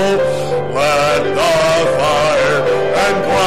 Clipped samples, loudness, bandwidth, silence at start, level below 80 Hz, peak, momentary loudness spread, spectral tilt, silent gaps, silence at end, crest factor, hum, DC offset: under 0.1%; -14 LUFS; 16 kHz; 0 s; -40 dBFS; -6 dBFS; 3 LU; -4 dB/octave; none; 0 s; 6 dB; none; 3%